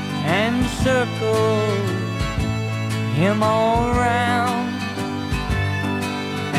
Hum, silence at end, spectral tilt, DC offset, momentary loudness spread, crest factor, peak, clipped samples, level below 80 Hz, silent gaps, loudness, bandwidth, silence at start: none; 0 s; -6 dB/octave; under 0.1%; 7 LU; 16 dB; -4 dBFS; under 0.1%; -34 dBFS; none; -21 LUFS; 15 kHz; 0 s